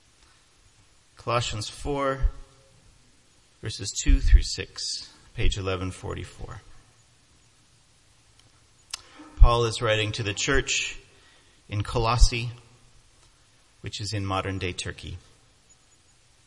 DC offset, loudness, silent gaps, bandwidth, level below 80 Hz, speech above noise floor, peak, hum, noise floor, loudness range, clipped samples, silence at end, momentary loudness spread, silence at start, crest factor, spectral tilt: under 0.1%; -27 LUFS; none; 11.5 kHz; -28 dBFS; 35 dB; 0 dBFS; none; -60 dBFS; 9 LU; under 0.1%; 1.25 s; 18 LU; 1.25 s; 26 dB; -4 dB/octave